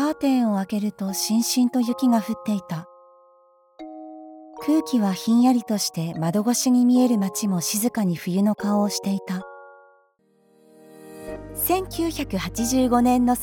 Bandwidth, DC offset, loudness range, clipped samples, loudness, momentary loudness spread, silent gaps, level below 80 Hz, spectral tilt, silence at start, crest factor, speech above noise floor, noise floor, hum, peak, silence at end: 19.5 kHz; under 0.1%; 8 LU; under 0.1%; -22 LUFS; 18 LU; none; -50 dBFS; -5 dB/octave; 0 s; 16 dB; 41 dB; -62 dBFS; none; -8 dBFS; 0 s